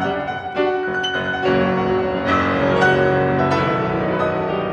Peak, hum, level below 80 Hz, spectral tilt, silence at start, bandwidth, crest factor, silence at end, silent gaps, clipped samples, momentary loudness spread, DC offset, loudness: -2 dBFS; none; -44 dBFS; -6.5 dB/octave; 0 s; 8.6 kHz; 16 dB; 0 s; none; under 0.1%; 6 LU; under 0.1%; -18 LUFS